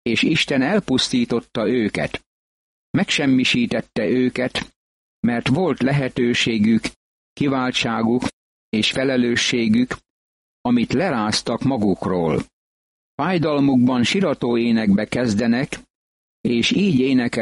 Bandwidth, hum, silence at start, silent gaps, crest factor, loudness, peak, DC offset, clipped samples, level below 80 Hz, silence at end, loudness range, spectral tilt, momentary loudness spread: 11.5 kHz; none; 0.05 s; 2.26-2.94 s, 4.76-5.23 s, 6.96-7.36 s, 8.33-8.72 s, 10.10-10.64 s, 12.53-13.18 s, 15.90-16.44 s; 14 dB; -19 LUFS; -6 dBFS; under 0.1%; under 0.1%; -50 dBFS; 0 s; 2 LU; -5 dB/octave; 8 LU